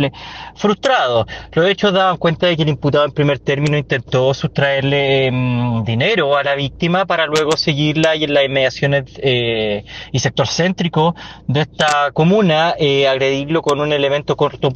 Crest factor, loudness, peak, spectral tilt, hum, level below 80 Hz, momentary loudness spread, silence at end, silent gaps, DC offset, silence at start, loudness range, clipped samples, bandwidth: 12 dB; -16 LUFS; -2 dBFS; -5.5 dB/octave; none; -46 dBFS; 5 LU; 0 s; none; under 0.1%; 0 s; 1 LU; under 0.1%; 9.2 kHz